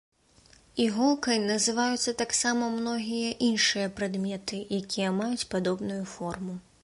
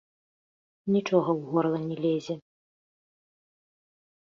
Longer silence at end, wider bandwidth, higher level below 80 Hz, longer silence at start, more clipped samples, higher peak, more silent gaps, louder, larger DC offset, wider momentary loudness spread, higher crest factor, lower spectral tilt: second, 0.25 s vs 1.85 s; first, 11.5 kHz vs 7.4 kHz; first, -62 dBFS vs -74 dBFS; about the same, 0.75 s vs 0.85 s; neither; about the same, -10 dBFS vs -10 dBFS; neither; about the same, -28 LUFS vs -27 LUFS; neither; second, 10 LU vs 13 LU; about the same, 18 dB vs 22 dB; second, -3.5 dB/octave vs -7.5 dB/octave